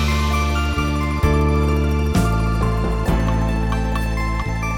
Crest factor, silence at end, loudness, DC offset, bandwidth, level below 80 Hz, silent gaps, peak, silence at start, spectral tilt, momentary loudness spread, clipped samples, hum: 14 dB; 0 s; -20 LUFS; under 0.1%; 16.5 kHz; -22 dBFS; none; -4 dBFS; 0 s; -6.5 dB/octave; 4 LU; under 0.1%; none